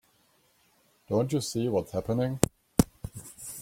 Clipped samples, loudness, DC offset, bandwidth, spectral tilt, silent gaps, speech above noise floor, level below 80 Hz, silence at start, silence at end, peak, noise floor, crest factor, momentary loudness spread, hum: under 0.1%; -29 LUFS; under 0.1%; 16.5 kHz; -5.5 dB/octave; none; 39 dB; -50 dBFS; 1.1 s; 0 s; 0 dBFS; -67 dBFS; 30 dB; 14 LU; none